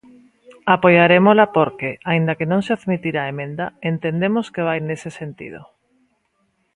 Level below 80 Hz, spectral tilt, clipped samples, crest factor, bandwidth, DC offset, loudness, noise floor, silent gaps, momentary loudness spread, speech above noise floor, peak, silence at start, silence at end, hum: -60 dBFS; -7.5 dB/octave; under 0.1%; 18 dB; 10.5 kHz; under 0.1%; -18 LUFS; -67 dBFS; none; 16 LU; 49 dB; 0 dBFS; 0.5 s; 1.1 s; none